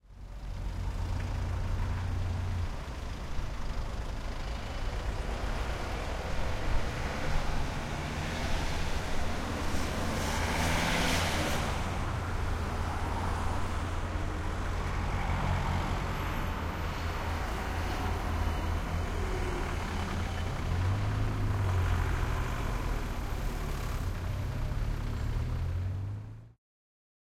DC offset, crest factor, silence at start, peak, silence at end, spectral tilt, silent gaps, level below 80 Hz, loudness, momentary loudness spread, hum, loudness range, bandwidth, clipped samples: under 0.1%; 16 dB; 0.1 s; -16 dBFS; 0.8 s; -5 dB/octave; none; -36 dBFS; -34 LUFS; 8 LU; none; 6 LU; 16 kHz; under 0.1%